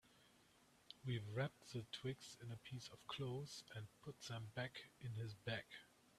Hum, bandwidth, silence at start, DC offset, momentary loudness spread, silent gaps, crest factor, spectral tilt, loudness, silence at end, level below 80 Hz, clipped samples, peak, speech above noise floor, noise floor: none; 14 kHz; 0.05 s; under 0.1%; 9 LU; none; 20 dB; -5 dB/octave; -51 LUFS; 0 s; -78 dBFS; under 0.1%; -30 dBFS; 23 dB; -73 dBFS